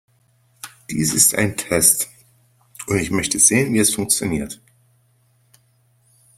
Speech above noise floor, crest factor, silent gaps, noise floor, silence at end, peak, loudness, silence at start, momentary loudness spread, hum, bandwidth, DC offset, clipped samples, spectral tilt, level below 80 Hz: 42 dB; 22 dB; none; -60 dBFS; 1.85 s; 0 dBFS; -17 LUFS; 0.65 s; 22 LU; none; 16.5 kHz; under 0.1%; under 0.1%; -3 dB/octave; -50 dBFS